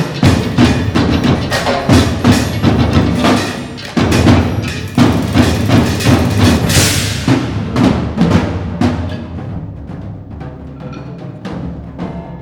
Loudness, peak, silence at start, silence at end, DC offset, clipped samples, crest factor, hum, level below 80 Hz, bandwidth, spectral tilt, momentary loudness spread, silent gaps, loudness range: -12 LUFS; 0 dBFS; 0 s; 0 s; under 0.1%; 0.1%; 12 dB; none; -26 dBFS; over 20 kHz; -5.5 dB/octave; 17 LU; none; 10 LU